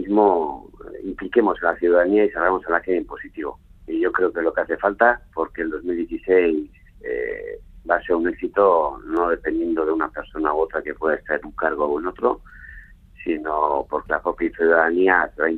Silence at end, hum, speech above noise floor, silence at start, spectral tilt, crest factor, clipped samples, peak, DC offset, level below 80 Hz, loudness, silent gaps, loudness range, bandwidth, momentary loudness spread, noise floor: 0 s; none; 23 dB; 0 s; -8 dB/octave; 20 dB; under 0.1%; 0 dBFS; under 0.1%; -46 dBFS; -21 LUFS; none; 3 LU; 4.3 kHz; 14 LU; -44 dBFS